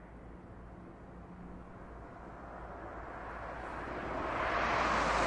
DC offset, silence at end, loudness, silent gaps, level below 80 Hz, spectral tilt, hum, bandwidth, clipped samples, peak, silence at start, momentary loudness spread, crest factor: under 0.1%; 0 s; -37 LUFS; none; -52 dBFS; -4.5 dB/octave; none; 11 kHz; under 0.1%; -18 dBFS; 0 s; 21 LU; 20 dB